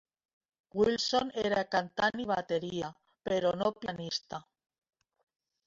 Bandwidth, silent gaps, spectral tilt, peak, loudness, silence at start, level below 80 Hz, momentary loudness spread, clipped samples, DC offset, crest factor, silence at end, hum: 7.8 kHz; none; -4 dB/octave; -14 dBFS; -32 LUFS; 0.75 s; -66 dBFS; 12 LU; under 0.1%; under 0.1%; 20 dB; 1.25 s; none